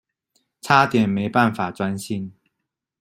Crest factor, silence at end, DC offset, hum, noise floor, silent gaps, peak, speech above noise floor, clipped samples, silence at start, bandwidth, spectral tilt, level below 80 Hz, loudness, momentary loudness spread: 20 dB; 0.7 s; under 0.1%; none; -81 dBFS; none; -2 dBFS; 61 dB; under 0.1%; 0.65 s; 15.5 kHz; -6 dB/octave; -60 dBFS; -20 LUFS; 14 LU